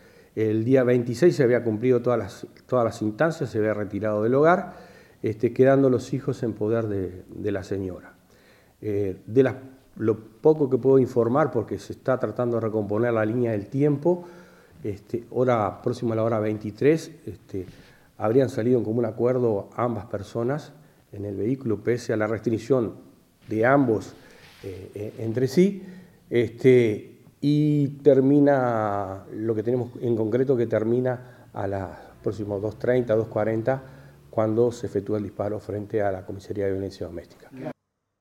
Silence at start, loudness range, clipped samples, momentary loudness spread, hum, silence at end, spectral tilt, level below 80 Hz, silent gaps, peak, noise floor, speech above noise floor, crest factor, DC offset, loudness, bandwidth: 0.35 s; 5 LU; under 0.1%; 15 LU; none; 0.5 s; -8 dB/octave; -62 dBFS; none; -4 dBFS; -56 dBFS; 32 dB; 20 dB; under 0.1%; -24 LUFS; 13.5 kHz